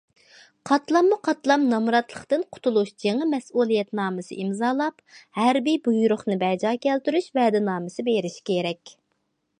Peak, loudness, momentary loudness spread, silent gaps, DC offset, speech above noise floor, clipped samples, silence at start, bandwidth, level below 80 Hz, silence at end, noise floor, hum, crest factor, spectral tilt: -6 dBFS; -23 LUFS; 7 LU; none; under 0.1%; 51 dB; under 0.1%; 0.65 s; 10.5 kHz; -74 dBFS; 0.7 s; -74 dBFS; none; 18 dB; -5.5 dB/octave